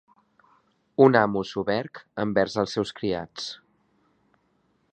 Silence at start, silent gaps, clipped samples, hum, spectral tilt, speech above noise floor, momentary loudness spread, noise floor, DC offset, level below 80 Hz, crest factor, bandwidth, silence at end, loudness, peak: 1 s; none; under 0.1%; none; -6 dB/octave; 45 dB; 17 LU; -68 dBFS; under 0.1%; -60 dBFS; 24 dB; 9 kHz; 1.4 s; -25 LUFS; -2 dBFS